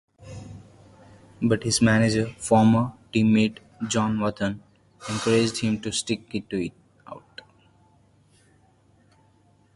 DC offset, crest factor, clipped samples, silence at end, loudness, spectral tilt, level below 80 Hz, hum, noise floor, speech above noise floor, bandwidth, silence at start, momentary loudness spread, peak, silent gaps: under 0.1%; 22 dB; under 0.1%; 2.55 s; -23 LUFS; -5 dB/octave; -54 dBFS; none; -60 dBFS; 38 dB; 11.5 kHz; 0.2 s; 22 LU; -4 dBFS; none